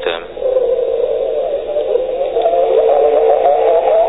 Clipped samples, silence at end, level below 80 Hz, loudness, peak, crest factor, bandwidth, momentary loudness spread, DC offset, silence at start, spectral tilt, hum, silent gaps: under 0.1%; 0 s; -46 dBFS; -14 LUFS; -2 dBFS; 12 dB; 4 kHz; 7 LU; 0.8%; 0 s; -7.5 dB/octave; none; none